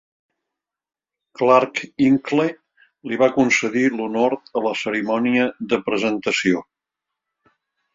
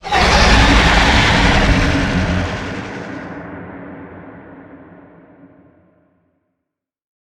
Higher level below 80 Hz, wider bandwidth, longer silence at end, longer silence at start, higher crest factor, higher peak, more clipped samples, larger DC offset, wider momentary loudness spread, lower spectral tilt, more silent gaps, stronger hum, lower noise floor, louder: second, -64 dBFS vs -22 dBFS; second, 7.8 kHz vs 12.5 kHz; second, 1.35 s vs 2.55 s; first, 1.4 s vs 0.05 s; about the same, 20 dB vs 16 dB; about the same, -2 dBFS vs 0 dBFS; neither; neither; second, 7 LU vs 23 LU; about the same, -5 dB/octave vs -4.5 dB/octave; neither; neither; first, -84 dBFS vs -79 dBFS; second, -20 LUFS vs -13 LUFS